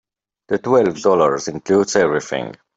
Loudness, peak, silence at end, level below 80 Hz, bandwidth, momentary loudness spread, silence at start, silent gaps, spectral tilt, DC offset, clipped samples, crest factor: -17 LUFS; -2 dBFS; 0.25 s; -58 dBFS; 8 kHz; 9 LU; 0.5 s; none; -5 dB/octave; under 0.1%; under 0.1%; 16 dB